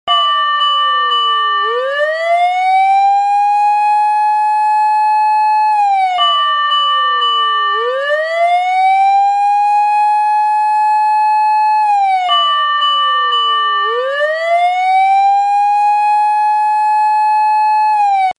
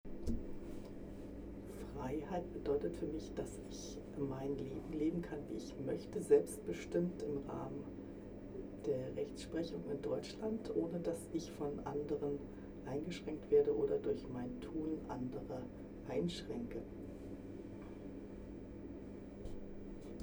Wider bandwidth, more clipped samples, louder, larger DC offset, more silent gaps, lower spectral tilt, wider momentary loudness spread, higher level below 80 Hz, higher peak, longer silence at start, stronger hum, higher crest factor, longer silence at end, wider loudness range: second, 10 kHz vs over 20 kHz; neither; first, -12 LUFS vs -42 LUFS; neither; neither; second, 2 dB/octave vs -6.5 dB/octave; second, 3 LU vs 13 LU; second, -74 dBFS vs -56 dBFS; first, -2 dBFS vs -18 dBFS; about the same, 0.05 s vs 0.05 s; neither; second, 10 dB vs 24 dB; about the same, 0.05 s vs 0 s; second, 1 LU vs 7 LU